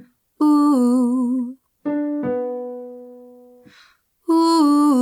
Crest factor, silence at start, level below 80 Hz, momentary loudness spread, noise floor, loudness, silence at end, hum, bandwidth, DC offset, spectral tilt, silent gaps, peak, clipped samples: 12 dB; 0.4 s; -72 dBFS; 18 LU; -55 dBFS; -18 LUFS; 0 s; none; 13 kHz; under 0.1%; -5 dB/octave; none; -6 dBFS; under 0.1%